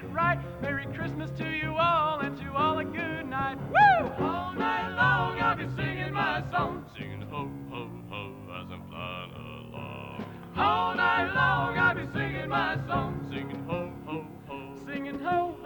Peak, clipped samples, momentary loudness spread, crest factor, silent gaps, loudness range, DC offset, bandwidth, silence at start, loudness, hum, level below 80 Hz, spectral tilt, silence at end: -10 dBFS; under 0.1%; 15 LU; 20 dB; none; 10 LU; under 0.1%; 19.5 kHz; 0 s; -28 LUFS; none; -52 dBFS; -7 dB/octave; 0 s